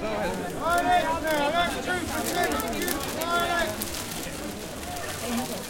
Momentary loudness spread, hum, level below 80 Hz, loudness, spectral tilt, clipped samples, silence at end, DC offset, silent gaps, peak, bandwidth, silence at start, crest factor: 10 LU; none; -46 dBFS; -27 LUFS; -3 dB/octave; under 0.1%; 0 s; under 0.1%; none; -8 dBFS; 17 kHz; 0 s; 20 dB